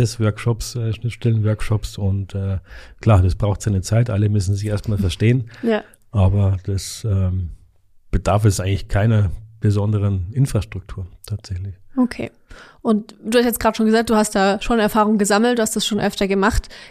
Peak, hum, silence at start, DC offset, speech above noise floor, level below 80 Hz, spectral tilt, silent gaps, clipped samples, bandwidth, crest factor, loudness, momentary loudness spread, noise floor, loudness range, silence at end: -2 dBFS; none; 0 s; under 0.1%; 31 dB; -34 dBFS; -6 dB/octave; none; under 0.1%; 15 kHz; 16 dB; -19 LUFS; 11 LU; -49 dBFS; 5 LU; 0 s